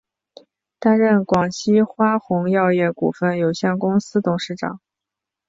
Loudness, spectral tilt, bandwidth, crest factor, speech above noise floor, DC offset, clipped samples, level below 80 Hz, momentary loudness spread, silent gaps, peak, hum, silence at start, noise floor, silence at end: -19 LUFS; -6.5 dB/octave; 7.8 kHz; 16 dB; 67 dB; under 0.1%; under 0.1%; -58 dBFS; 8 LU; none; -4 dBFS; none; 0.8 s; -85 dBFS; 0.7 s